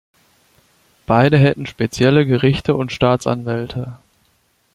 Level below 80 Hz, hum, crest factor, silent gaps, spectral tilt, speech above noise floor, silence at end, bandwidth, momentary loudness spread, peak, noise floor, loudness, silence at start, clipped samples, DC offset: -44 dBFS; none; 18 dB; none; -7 dB/octave; 45 dB; 0.8 s; 12 kHz; 10 LU; 0 dBFS; -61 dBFS; -16 LUFS; 1.1 s; under 0.1%; under 0.1%